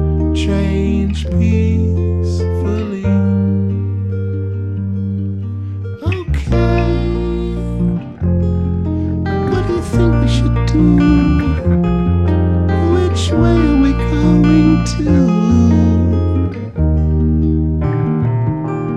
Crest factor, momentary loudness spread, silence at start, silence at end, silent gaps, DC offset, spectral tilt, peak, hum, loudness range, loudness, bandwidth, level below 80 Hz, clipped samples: 14 dB; 8 LU; 0 s; 0 s; none; under 0.1%; -8 dB/octave; 0 dBFS; none; 6 LU; -15 LUFS; 9.2 kHz; -22 dBFS; under 0.1%